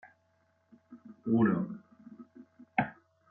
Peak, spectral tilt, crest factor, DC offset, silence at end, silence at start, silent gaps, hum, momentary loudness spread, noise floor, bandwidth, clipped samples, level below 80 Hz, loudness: -12 dBFS; -10.5 dB/octave; 22 dB; under 0.1%; 0.4 s; 0.9 s; none; none; 27 LU; -72 dBFS; 3.6 kHz; under 0.1%; -74 dBFS; -32 LUFS